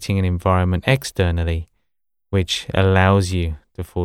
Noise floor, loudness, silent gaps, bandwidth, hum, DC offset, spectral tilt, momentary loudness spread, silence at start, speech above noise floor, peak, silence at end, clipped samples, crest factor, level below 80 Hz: -80 dBFS; -19 LUFS; none; 17 kHz; none; under 0.1%; -6 dB/octave; 11 LU; 0 s; 62 dB; -2 dBFS; 0 s; under 0.1%; 16 dB; -38 dBFS